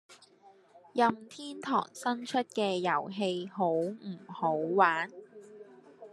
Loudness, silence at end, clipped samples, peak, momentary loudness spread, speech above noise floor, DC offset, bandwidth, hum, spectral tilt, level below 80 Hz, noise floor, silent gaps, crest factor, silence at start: -31 LUFS; 0.05 s; under 0.1%; -10 dBFS; 17 LU; 29 dB; under 0.1%; 12.5 kHz; none; -5 dB/octave; -86 dBFS; -60 dBFS; none; 22 dB; 0.1 s